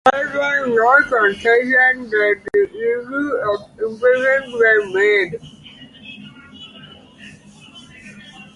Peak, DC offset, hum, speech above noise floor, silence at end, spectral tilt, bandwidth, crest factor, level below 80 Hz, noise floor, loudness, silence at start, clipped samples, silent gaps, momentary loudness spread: 0 dBFS; under 0.1%; none; 26 dB; 0.15 s; -4.5 dB/octave; 11.5 kHz; 18 dB; -56 dBFS; -42 dBFS; -16 LUFS; 0.05 s; under 0.1%; none; 23 LU